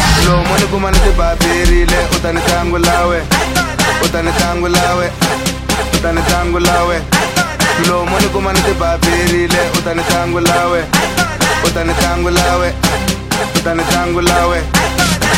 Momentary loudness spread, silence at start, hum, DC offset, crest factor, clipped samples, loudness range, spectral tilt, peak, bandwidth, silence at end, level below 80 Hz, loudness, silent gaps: 3 LU; 0 s; none; under 0.1%; 12 dB; under 0.1%; 1 LU; -4 dB/octave; 0 dBFS; 16.5 kHz; 0 s; -20 dBFS; -13 LUFS; none